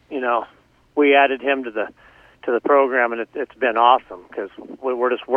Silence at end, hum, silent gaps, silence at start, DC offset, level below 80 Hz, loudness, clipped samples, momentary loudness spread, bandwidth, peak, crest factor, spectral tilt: 0 s; none; none; 0.1 s; under 0.1%; -64 dBFS; -19 LUFS; under 0.1%; 16 LU; 4 kHz; 0 dBFS; 20 dB; -5.5 dB/octave